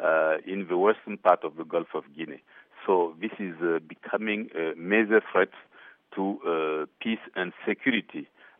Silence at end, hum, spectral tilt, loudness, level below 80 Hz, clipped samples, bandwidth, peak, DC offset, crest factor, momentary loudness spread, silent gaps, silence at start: 0.35 s; none; -3.5 dB/octave; -27 LUFS; -84 dBFS; under 0.1%; 3.8 kHz; -6 dBFS; under 0.1%; 22 dB; 13 LU; none; 0 s